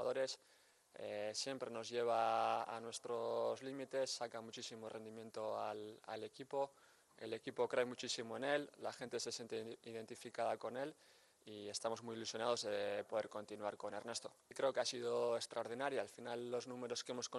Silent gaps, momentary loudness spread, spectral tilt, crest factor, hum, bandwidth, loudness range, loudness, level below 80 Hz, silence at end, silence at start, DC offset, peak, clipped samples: none; 11 LU; -3 dB/octave; 20 dB; none; 12 kHz; 5 LU; -44 LUFS; under -90 dBFS; 0 s; 0 s; under 0.1%; -24 dBFS; under 0.1%